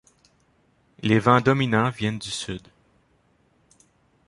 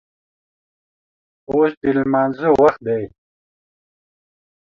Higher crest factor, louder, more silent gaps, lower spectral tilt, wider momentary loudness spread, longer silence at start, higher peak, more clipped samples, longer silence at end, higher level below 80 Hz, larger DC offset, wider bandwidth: about the same, 22 dB vs 20 dB; second, -22 LUFS vs -17 LUFS; second, none vs 1.77-1.81 s; second, -6 dB/octave vs -8.5 dB/octave; first, 13 LU vs 10 LU; second, 1.05 s vs 1.5 s; about the same, -2 dBFS vs -2 dBFS; neither; about the same, 1.7 s vs 1.6 s; about the same, -56 dBFS vs -54 dBFS; neither; first, 11.5 kHz vs 7 kHz